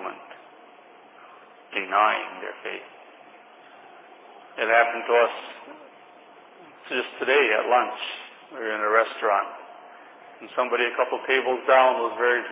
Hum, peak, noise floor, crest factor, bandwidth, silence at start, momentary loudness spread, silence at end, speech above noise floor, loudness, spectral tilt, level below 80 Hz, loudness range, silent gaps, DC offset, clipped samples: none; -4 dBFS; -50 dBFS; 20 dB; 4 kHz; 0 s; 20 LU; 0 s; 27 dB; -23 LUFS; -5.5 dB/octave; under -90 dBFS; 5 LU; none; under 0.1%; under 0.1%